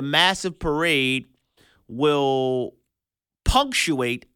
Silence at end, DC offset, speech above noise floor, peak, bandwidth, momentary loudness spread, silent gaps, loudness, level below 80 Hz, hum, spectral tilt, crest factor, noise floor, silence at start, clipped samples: 0.2 s; under 0.1%; 67 dB; -4 dBFS; 18.5 kHz; 9 LU; none; -22 LUFS; -36 dBFS; none; -3.5 dB/octave; 20 dB; -89 dBFS; 0 s; under 0.1%